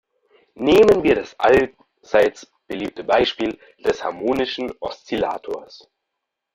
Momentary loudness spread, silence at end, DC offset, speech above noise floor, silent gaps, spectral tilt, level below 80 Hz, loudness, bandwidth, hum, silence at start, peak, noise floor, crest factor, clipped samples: 15 LU; 0.8 s; under 0.1%; 61 dB; none; -5 dB/octave; -48 dBFS; -19 LUFS; 15 kHz; none; 0.6 s; -2 dBFS; -80 dBFS; 18 dB; under 0.1%